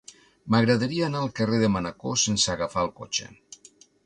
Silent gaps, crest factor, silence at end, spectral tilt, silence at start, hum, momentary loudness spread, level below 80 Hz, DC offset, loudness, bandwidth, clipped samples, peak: none; 18 dB; 0.5 s; -4 dB/octave; 0.45 s; none; 9 LU; -54 dBFS; under 0.1%; -25 LUFS; 11 kHz; under 0.1%; -8 dBFS